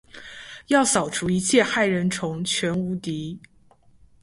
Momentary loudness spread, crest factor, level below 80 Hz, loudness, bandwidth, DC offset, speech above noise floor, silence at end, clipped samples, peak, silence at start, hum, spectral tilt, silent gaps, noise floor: 20 LU; 20 dB; -56 dBFS; -22 LUFS; 11.5 kHz; under 0.1%; 32 dB; 0.85 s; under 0.1%; -4 dBFS; 0.15 s; none; -4 dB/octave; none; -55 dBFS